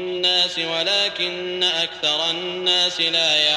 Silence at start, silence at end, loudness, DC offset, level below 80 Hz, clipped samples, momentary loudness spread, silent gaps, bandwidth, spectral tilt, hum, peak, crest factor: 0 s; 0 s; -19 LUFS; under 0.1%; -64 dBFS; under 0.1%; 5 LU; none; 15 kHz; -1.5 dB/octave; none; -6 dBFS; 16 dB